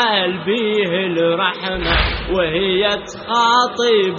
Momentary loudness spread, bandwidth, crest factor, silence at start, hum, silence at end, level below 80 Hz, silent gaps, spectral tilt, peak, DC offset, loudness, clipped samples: 5 LU; 7.2 kHz; 14 dB; 0 s; none; 0 s; -32 dBFS; none; -2 dB/octave; -2 dBFS; under 0.1%; -17 LUFS; under 0.1%